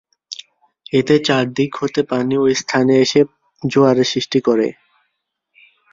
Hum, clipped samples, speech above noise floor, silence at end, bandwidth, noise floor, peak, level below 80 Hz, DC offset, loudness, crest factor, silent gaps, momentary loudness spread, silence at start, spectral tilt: none; under 0.1%; 57 dB; 1.2 s; 7.6 kHz; -73 dBFS; 0 dBFS; -58 dBFS; under 0.1%; -16 LUFS; 16 dB; none; 12 LU; 0.3 s; -5 dB/octave